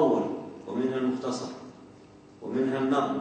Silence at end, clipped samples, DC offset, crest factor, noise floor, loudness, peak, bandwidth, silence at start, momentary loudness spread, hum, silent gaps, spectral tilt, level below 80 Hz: 0 s; under 0.1%; under 0.1%; 18 dB; -52 dBFS; -29 LUFS; -12 dBFS; 9 kHz; 0 s; 18 LU; none; none; -6 dB/octave; -72 dBFS